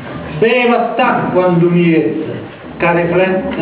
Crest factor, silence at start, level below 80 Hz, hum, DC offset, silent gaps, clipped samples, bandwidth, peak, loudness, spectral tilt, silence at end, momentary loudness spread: 12 dB; 0 s; -44 dBFS; none; 0.1%; none; under 0.1%; 4 kHz; 0 dBFS; -13 LUFS; -11 dB/octave; 0 s; 13 LU